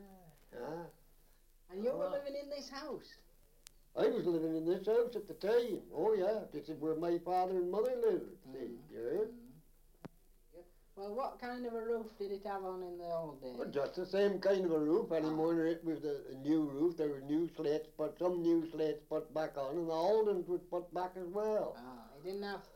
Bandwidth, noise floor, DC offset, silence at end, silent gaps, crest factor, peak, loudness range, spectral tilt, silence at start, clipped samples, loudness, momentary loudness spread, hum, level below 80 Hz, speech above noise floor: 16.5 kHz; -65 dBFS; under 0.1%; 0 s; none; 16 dB; -22 dBFS; 8 LU; -7 dB/octave; 0 s; under 0.1%; -37 LUFS; 14 LU; none; -66 dBFS; 29 dB